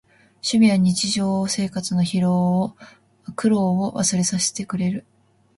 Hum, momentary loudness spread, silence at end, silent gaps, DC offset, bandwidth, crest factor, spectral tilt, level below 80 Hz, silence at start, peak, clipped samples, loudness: none; 10 LU; 0.55 s; none; under 0.1%; 11.5 kHz; 14 dB; -5 dB/octave; -58 dBFS; 0.45 s; -6 dBFS; under 0.1%; -21 LUFS